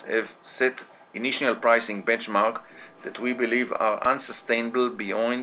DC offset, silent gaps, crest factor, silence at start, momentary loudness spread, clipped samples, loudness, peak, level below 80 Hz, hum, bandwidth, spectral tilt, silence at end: under 0.1%; none; 20 dB; 0 s; 16 LU; under 0.1%; -25 LUFS; -6 dBFS; -72 dBFS; none; 4 kHz; -8 dB/octave; 0 s